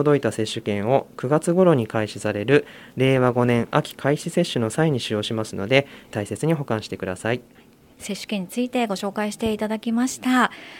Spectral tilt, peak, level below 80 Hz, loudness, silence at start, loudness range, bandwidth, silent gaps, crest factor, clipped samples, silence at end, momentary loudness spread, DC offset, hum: -5.5 dB/octave; 0 dBFS; -56 dBFS; -22 LUFS; 0 s; 6 LU; 17 kHz; none; 22 dB; under 0.1%; 0 s; 9 LU; under 0.1%; none